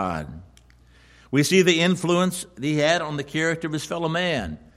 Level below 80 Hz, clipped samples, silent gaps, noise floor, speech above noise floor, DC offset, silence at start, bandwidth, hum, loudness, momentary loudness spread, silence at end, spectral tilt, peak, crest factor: -50 dBFS; under 0.1%; none; -53 dBFS; 30 dB; under 0.1%; 0 s; 15.5 kHz; none; -22 LUFS; 11 LU; 0.2 s; -4.5 dB/octave; -6 dBFS; 18 dB